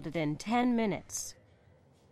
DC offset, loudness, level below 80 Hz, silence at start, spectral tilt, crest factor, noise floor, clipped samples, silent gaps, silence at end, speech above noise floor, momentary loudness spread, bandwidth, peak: under 0.1%; -32 LUFS; -60 dBFS; 0 s; -4.5 dB/octave; 16 dB; -63 dBFS; under 0.1%; none; 0.8 s; 31 dB; 10 LU; 14.5 kHz; -18 dBFS